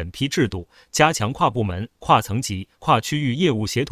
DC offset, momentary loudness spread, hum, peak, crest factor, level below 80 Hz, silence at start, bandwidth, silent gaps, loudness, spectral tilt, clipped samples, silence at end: under 0.1%; 9 LU; none; 0 dBFS; 20 dB; -42 dBFS; 0 s; 16 kHz; none; -21 LUFS; -4.5 dB/octave; under 0.1%; 0 s